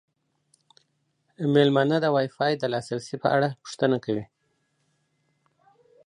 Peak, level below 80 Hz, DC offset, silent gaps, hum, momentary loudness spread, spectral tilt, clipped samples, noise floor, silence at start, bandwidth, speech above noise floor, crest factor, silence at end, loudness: -6 dBFS; -70 dBFS; under 0.1%; none; none; 10 LU; -6.5 dB/octave; under 0.1%; -72 dBFS; 1.4 s; 11 kHz; 49 dB; 20 dB; 1.85 s; -24 LUFS